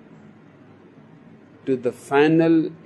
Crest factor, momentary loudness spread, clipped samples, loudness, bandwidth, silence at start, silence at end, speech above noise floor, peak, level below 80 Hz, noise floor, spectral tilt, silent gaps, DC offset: 18 dB; 10 LU; under 0.1%; -19 LUFS; 11.5 kHz; 1.65 s; 0.1 s; 29 dB; -4 dBFS; -72 dBFS; -48 dBFS; -7.5 dB/octave; none; under 0.1%